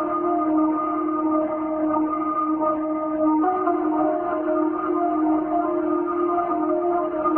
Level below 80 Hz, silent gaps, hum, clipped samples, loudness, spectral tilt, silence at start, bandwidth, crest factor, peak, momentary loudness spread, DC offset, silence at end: -58 dBFS; none; none; under 0.1%; -22 LUFS; -11.5 dB/octave; 0 s; 3.1 kHz; 14 dB; -8 dBFS; 3 LU; under 0.1%; 0 s